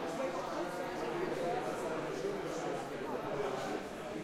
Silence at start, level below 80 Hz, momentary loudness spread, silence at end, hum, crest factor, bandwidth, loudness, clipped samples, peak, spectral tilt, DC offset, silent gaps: 0 s; -66 dBFS; 3 LU; 0 s; none; 14 dB; 16 kHz; -38 LUFS; under 0.1%; -24 dBFS; -5 dB/octave; under 0.1%; none